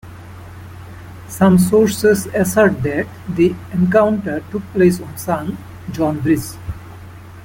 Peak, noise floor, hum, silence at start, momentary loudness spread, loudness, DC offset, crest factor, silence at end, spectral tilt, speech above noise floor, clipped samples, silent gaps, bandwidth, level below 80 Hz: -2 dBFS; -36 dBFS; none; 0.05 s; 22 LU; -16 LUFS; under 0.1%; 16 dB; 0 s; -6.5 dB/octave; 20 dB; under 0.1%; none; 17 kHz; -42 dBFS